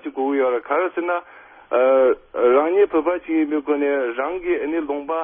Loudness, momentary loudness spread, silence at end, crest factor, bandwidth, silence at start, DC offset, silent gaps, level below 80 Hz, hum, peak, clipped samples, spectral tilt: -20 LUFS; 8 LU; 0 s; 14 dB; 3.6 kHz; 0.05 s; under 0.1%; none; -60 dBFS; none; -4 dBFS; under 0.1%; -9 dB/octave